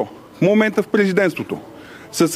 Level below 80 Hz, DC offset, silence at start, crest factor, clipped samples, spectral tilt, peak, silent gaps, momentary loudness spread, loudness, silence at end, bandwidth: -62 dBFS; under 0.1%; 0 s; 16 dB; under 0.1%; -5.5 dB/octave; -2 dBFS; none; 16 LU; -18 LUFS; 0 s; 15.5 kHz